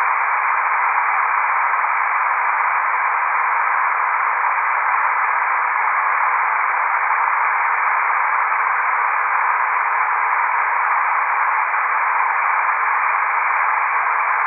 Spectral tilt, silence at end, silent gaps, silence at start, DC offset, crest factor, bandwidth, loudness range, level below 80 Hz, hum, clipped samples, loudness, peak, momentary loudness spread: -3.5 dB/octave; 0 s; none; 0 s; under 0.1%; 14 dB; 3.3 kHz; 0 LU; under -90 dBFS; none; under 0.1%; -17 LUFS; -4 dBFS; 1 LU